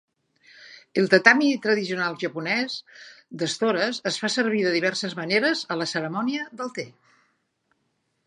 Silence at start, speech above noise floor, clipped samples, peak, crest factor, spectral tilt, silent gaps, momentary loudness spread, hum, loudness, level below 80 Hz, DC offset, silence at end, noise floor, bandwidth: 0.6 s; 49 dB; under 0.1%; 0 dBFS; 24 dB; -4 dB/octave; none; 15 LU; none; -23 LUFS; -76 dBFS; under 0.1%; 1.35 s; -73 dBFS; 11.5 kHz